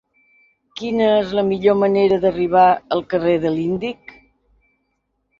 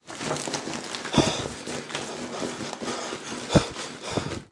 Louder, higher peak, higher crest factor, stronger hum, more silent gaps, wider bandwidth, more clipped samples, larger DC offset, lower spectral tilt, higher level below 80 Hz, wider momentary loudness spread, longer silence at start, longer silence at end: first, -17 LUFS vs -29 LUFS; about the same, -2 dBFS vs -4 dBFS; second, 16 dB vs 26 dB; neither; neither; second, 7.2 kHz vs 11.5 kHz; neither; neither; first, -7.5 dB/octave vs -4 dB/octave; about the same, -52 dBFS vs -48 dBFS; first, 12 LU vs 9 LU; first, 0.75 s vs 0.05 s; first, 1.45 s vs 0.05 s